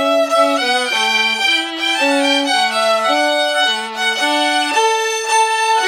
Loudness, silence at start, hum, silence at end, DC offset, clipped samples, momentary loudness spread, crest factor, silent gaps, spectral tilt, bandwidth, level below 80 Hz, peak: -14 LUFS; 0 s; none; 0 s; under 0.1%; under 0.1%; 3 LU; 14 dB; none; 0 dB/octave; 19 kHz; -70 dBFS; -2 dBFS